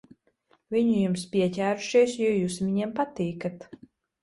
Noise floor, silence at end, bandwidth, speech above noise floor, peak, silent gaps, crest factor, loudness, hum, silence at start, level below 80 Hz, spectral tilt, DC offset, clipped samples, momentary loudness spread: -67 dBFS; 0.6 s; 11.5 kHz; 41 dB; -10 dBFS; none; 16 dB; -26 LUFS; none; 0.7 s; -64 dBFS; -6 dB/octave; under 0.1%; under 0.1%; 8 LU